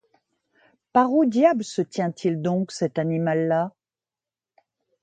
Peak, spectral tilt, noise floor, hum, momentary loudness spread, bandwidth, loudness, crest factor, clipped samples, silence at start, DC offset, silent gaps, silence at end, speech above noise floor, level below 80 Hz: -4 dBFS; -7 dB/octave; under -90 dBFS; none; 8 LU; 9.2 kHz; -23 LUFS; 20 dB; under 0.1%; 0.95 s; under 0.1%; none; 1.35 s; over 68 dB; -70 dBFS